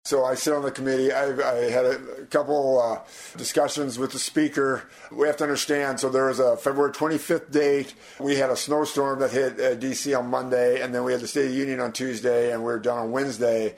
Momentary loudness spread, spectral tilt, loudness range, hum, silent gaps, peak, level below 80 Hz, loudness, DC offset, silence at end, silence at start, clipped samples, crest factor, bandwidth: 5 LU; -4 dB/octave; 1 LU; none; none; -8 dBFS; -66 dBFS; -24 LUFS; under 0.1%; 0 s; 0.05 s; under 0.1%; 16 dB; 16 kHz